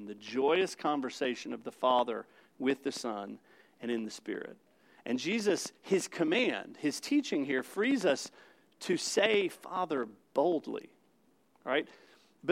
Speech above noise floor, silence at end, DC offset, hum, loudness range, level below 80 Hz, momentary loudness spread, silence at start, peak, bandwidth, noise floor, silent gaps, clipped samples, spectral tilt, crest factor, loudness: 37 dB; 0 s; under 0.1%; none; 5 LU; under -90 dBFS; 13 LU; 0 s; -12 dBFS; 16 kHz; -70 dBFS; none; under 0.1%; -3.5 dB/octave; 22 dB; -33 LUFS